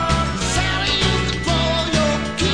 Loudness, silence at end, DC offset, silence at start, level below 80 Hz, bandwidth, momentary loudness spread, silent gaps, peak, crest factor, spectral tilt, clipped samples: -19 LUFS; 0 s; 0.9%; 0 s; -28 dBFS; 10.5 kHz; 3 LU; none; -4 dBFS; 14 dB; -4 dB/octave; under 0.1%